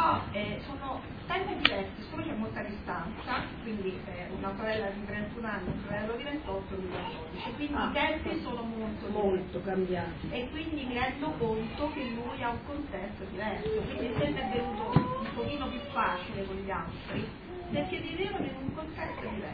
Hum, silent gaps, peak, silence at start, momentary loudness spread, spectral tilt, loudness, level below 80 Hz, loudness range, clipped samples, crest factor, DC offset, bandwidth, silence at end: none; none; -4 dBFS; 0 s; 9 LU; -8.5 dB/octave; -34 LUFS; -48 dBFS; 3 LU; under 0.1%; 30 dB; under 0.1%; 5.2 kHz; 0 s